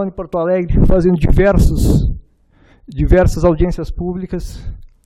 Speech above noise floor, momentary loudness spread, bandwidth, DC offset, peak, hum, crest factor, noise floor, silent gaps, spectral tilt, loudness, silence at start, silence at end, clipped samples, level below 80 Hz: 37 dB; 17 LU; 14.5 kHz; under 0.1%; 0 dBFS; none; 14 dB; -50 dBFS; none; -8 dB/octave; -15 LUFS; 0 s; 0.2 s; under 0.1%; -18 dBFS